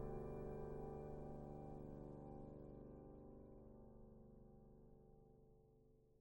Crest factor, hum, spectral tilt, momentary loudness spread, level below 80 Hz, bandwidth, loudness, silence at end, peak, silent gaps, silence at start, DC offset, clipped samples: 18 dB; none; -10 dB/octave; 15 LU; -62 dBFS; 16 kHz; -56 LUFS; 0 s; -38 dBFS; none; 0 s; under 0.1%; under 0.1%